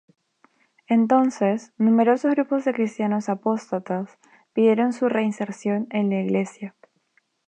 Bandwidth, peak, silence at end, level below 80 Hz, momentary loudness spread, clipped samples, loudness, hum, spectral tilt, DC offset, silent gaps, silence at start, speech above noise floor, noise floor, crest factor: 9 kHz; -6 dBFS; 0.8 s; -78 dBFS; 11 LU; under 0.1%; -22 LUFS; none; -7 dB/octave; under 0.1%; none; 0.9 s; 45 dB; -67 dBFS; 18 dB